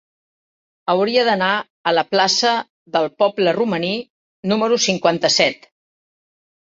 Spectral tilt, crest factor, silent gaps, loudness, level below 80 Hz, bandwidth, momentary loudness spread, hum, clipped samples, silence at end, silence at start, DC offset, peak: -3 dB/octave; 18 dB; 1.70-1.84 s, 2.70-2.86 s, 4.10-4.43 s; -18 LUFS; -64 dBFS; 8 kHz; 8 LU; none; under 0.1%; 1.1 s; 0.85 s; under 0.1%; -2 dBFS